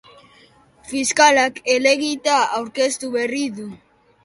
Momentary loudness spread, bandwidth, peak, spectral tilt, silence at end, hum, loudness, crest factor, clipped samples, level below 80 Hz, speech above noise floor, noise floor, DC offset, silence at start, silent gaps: 14 LU; 11.5 kHz; 0 dBFS; -1.5 dB/octave; 0.5 s; none; -18 LUFS; 20 dB; under 0.1%; -62 dBFS; 33 dB; -52 dBFS; under 0.1%; 0.85 s; none